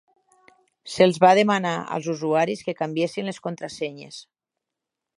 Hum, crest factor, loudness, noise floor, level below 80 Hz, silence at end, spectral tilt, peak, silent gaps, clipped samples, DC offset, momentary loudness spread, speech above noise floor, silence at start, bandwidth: none; 22 dB; -22 LUFS; -85 dBFS; -70 dBFS; 0.95 s; -5.5 dB/octave; -2 dBFS; none; under 0.1%; under 0.1%; 18 LU; 63 dB; 0.85 s; 11.5 kHz